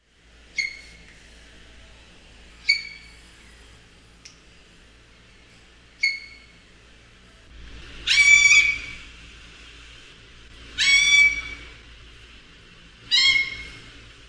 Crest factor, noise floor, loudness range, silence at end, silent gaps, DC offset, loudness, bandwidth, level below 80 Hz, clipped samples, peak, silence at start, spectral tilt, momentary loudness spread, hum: 22 dB; -53 dBFS; 14 LU; 0.5 s; none; under 0.1%; -17 LUFS; 10.5 kHz; -50 dBFS; under 0.1%; -4 dBFS; 0.55 s; 1.5 dB/octave; 26 LU; none